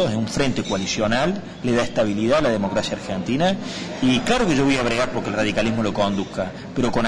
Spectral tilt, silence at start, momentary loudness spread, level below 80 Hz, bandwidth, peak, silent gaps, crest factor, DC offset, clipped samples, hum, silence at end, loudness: -5 dB/octave; 0 s; 8 LU; -40 dBFS; 11 kHz; -8 dBFS; none; 12 dB; under 0.1%; under 0.1%; none; 0 s; -21 LUFS